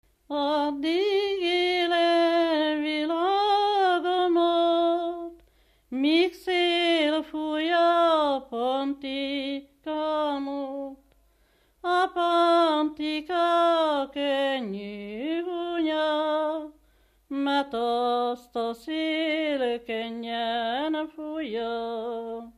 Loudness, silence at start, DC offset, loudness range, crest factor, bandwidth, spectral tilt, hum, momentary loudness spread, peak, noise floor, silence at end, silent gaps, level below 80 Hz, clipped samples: -26 LUFS; 0.3 s; under 0.1%; 5 LU; 14 dB; 12 kHz; -4 dB/octave; none; 12 LU; -12 dBFS; -64 dBFS; 0.1 s; none; -64 dBFS; under 0.1%